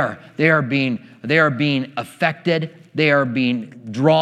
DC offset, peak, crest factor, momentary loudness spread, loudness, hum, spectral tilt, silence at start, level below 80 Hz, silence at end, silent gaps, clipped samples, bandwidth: under 0.1%; 0 dBFS; 18 dB; 11 LU; -19 LUFS; none; -7 dB/octave; 0 s; -72 dBFS; 0 s; none; under 0.1%; 12.5 kHz